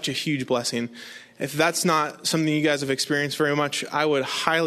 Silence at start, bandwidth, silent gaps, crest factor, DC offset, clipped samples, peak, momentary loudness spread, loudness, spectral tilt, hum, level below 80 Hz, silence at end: 0 s; 13.5 kHz; none; 22 dB; under 0.1%; under 0.1%; -2 dBFS; 9 LU; -23 LUFS; -3.5 dB/octave; none; -68 dBFS; 0 s